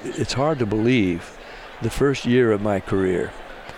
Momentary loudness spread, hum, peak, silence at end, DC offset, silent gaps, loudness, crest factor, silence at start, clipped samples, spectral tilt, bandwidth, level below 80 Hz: 17 LU; none; -6 dBFS; 0 s; under 0.1%; none; -21 LUFS; 16 dB; 0 s; under 0.1%; -6 dB/octave; 16 kHz; -42 dBFS